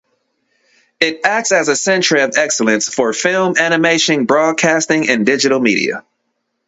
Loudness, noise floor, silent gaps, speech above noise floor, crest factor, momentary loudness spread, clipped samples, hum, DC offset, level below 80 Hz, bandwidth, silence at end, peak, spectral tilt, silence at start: -13 LUFS; -70 dBFS; none; 56 dB; 14 dB; 4 LU; under 0.1%; none; under 0.1%; -62 dBFS; 8.2 kHz; 0.7 s; 0 dBFS; -3 dB/octave; 1 s